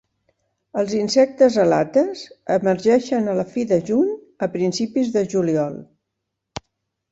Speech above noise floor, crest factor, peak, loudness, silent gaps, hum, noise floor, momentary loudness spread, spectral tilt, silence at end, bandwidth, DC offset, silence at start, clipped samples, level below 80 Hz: 60 dB; 18 dB; -4 dBFS; -20 LUFS; none; none; -79 dBFS; 15 LU; -6 dB/octave; 0.55 s; 8 kHz; under 0.1%; 0.75 s; under 0.1%; -60 dBFS